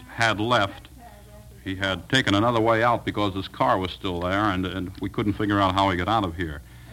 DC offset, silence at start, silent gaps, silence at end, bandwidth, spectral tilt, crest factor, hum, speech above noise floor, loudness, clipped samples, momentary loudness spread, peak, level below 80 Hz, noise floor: under 0.1%; 0 s; none; 0 s; 16.5 kHz; -5.5 dB/octave; 20 dB; none; 22 dB; -24 LUFS; under 0.1%; 11 LU; -4 dBFS; -46 dBFS; -45 dBFS